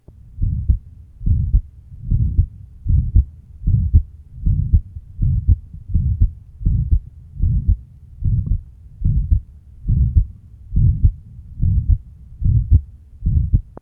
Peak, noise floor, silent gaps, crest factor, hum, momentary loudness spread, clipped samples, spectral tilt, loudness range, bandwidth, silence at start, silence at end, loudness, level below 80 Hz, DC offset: 0 dBFS; -36 dBFS; none; 18 dB; none; 11 LU; under 0.1%; -13.5 dB/octave; 2 LU; 0.7 kHz; 0.35 s; 0.2 s; -21 LUFS; -20 dBFS; under 0.1%